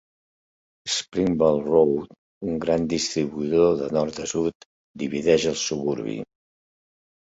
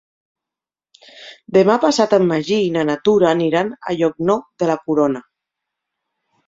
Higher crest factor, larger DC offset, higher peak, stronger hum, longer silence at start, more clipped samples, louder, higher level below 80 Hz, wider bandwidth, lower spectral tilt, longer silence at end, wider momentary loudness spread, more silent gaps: about the same, 20 dB vs 18 dB; neither; about the same, -4 dBFS vs -2 dBFS; neither; second, 0.85 s vs 1.15 s; neither; second, -23 LUFS vs -17 LUFS; first, -54 dBFS vs -60 dBFS; about the same, 8 kHz vs 7.8 kHz; about the same, -4.5 dB/octave vs -5.5 dB/octave; about the same, 1.15 s vs 1.25 s; first, 13 LU vs 6 LU; first, 2.18-2.41 s, 4.55-4.94 s vs none